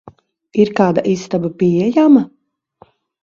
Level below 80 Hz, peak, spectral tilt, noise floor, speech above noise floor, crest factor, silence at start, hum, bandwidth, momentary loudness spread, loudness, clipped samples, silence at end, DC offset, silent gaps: -56 dBFS; 0 dBFS; -7.5 dB/octave; -50 dBFS; 37 dB; 16 dB; 0.55 s; none; 7.4 kHz; 10 LU; -14 LUFS; under 0.1%; 0.95 s; under 0.1%; none